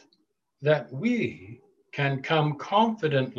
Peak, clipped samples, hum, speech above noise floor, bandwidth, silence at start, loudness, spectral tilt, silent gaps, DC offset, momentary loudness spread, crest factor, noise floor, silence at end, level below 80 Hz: -8 dBFS; under 0.1%; none; 45 dB; 7.2 kHz; 0.6 s; -26 LUFS; -7 dB/octave; none; under 0.1%; 8 LU; 18 dB; -71 dBFS; 0 s; -68 dBFS